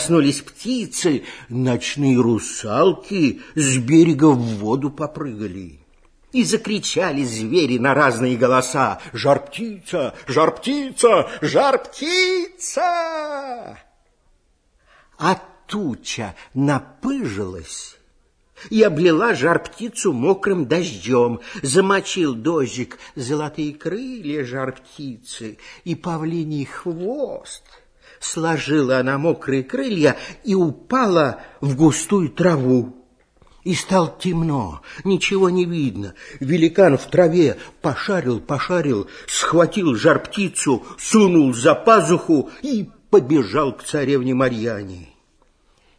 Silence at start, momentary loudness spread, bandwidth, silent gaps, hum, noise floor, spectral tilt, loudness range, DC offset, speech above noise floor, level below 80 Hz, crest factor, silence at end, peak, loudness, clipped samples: 0 s; 13 LU; 11 kHz; none; none; -61 dBFS; -5 dB/octave; 9 LU; under 0.1%; 42 dB; -52 dBFS; 20 dB; 0.95 s; 0 dBFS; -19 LUFS; under 0.1%